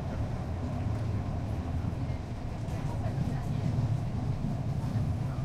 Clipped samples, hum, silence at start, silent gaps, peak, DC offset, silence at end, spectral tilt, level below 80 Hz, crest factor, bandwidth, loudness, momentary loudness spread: under 0.1%; none; 0 s; none; -18 dBFS; under 0.1%; 0 s; -8 dB/octave; -40 dBFS; 14 dB; 11 kHz; -33 LUFS; 4 LU